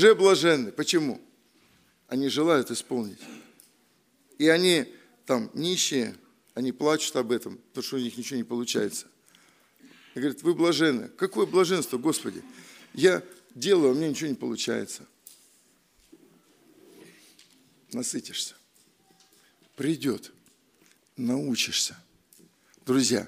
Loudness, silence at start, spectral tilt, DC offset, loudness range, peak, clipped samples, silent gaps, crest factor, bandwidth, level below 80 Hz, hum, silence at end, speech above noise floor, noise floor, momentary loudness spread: -26 LUFS; 0 s; -3.5 dB/octave; under 0.1%; 12 LU; -6 dBFS; under 0.1%; none; 22 dB; 15.5 kHz; -76 dBFS; none; 0 s; 40 dB; -65 dBFS; 17 LU